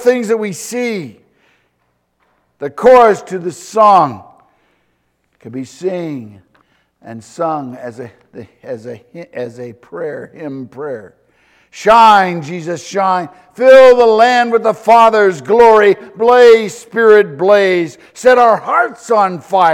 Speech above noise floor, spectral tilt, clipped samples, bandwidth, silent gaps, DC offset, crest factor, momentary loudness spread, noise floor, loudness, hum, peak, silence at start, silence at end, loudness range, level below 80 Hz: 52 dB; -4.5 dB/octave; 0.3%; 13.5 kHz; none; under 0.1%; 12 dB; 21 LU; -63 dBFS; -10 LUFS; none; 0 dBFS; 0 s; 0 s; 18 LU; -52 dBFS